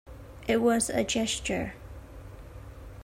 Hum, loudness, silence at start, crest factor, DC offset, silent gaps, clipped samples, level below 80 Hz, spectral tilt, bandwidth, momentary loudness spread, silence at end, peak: none; -28 LUFS; 0.05 s; 18 dB; under 0.1%; none; under 0.1%; -48 dBFS; -3.5 dB/octave; 16 kHz; 22 LU; 0 s; -14 dBFS